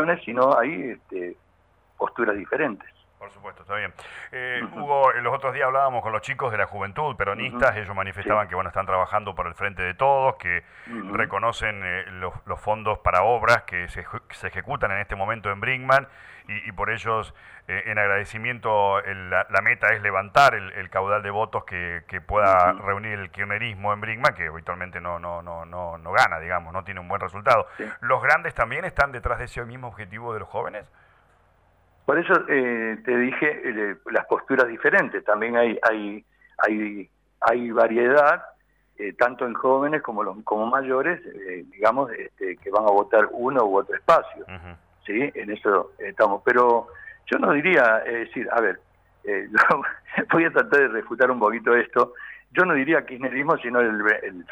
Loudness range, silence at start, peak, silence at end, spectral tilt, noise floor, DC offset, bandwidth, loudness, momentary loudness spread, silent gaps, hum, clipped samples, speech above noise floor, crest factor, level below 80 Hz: 5 LU; 0 s; -6 dBFS; 0 s; -6 dB/octave; -61 dBFS; under 0.1%; 14.5 kHz; -23 LUFS; 14 LU; none; none; under 0.1%; 38 dB; 18 dB; -50 dBFS